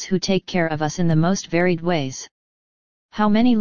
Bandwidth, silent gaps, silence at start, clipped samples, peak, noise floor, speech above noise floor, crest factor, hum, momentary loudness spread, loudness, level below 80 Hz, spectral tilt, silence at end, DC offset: 7.2 kHz; 2.31-3.09 s; 0 s; under 0.1%; -4 dBFS; under -90 dBFS; over 71 dB; 16 dB; none; 13 LU; -20 LUFS; -48 dBFS; -5.5 dB/octave; 0 s; under 0.1%